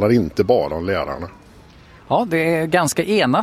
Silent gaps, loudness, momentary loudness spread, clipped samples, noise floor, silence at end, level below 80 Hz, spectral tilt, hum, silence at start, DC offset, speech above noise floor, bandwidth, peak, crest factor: none; -19 LUFS; 8 LU; under 0.1%; -45 dBFS; 0 s; -44 dBFS; -5 dB/octave; none; 0 s; under 0.1%; 27 dB; 15.5 kHz; -2 dBFS; 16 dB